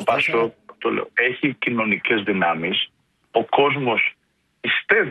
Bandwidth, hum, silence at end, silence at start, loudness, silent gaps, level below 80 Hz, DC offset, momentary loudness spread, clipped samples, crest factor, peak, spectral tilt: 12 kHz; none; 0 s; 0 s; -21 LUFS; none; -64 dBFS; under 0.1%; 7 LU; under 0.1%; 18 dB; -2 dBFS; -6 dB/octave